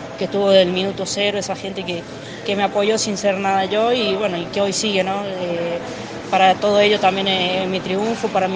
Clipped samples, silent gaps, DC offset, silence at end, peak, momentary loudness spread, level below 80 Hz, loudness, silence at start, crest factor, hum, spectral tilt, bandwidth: under 0.1%; none; under 0.1%; 0 s; 0 dBFS; 11 LU; -56 dBFS; -19 LUFS; 0 s; 18 dB; none; -4 dB/octave; 10 kHz